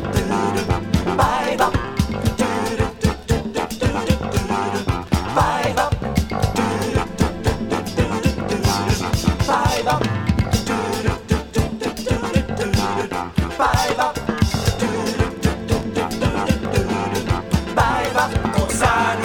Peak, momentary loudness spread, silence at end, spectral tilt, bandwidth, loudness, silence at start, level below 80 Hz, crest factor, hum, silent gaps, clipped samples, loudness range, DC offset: -4 dBFS; 5 LU; 0 s; -5.5 dB/octave; 18.5 kHz; -20 LUFS; 0 s; -30 dBFS; 16 dB; none; none; under 0.1%; 1 LU; under 0.1%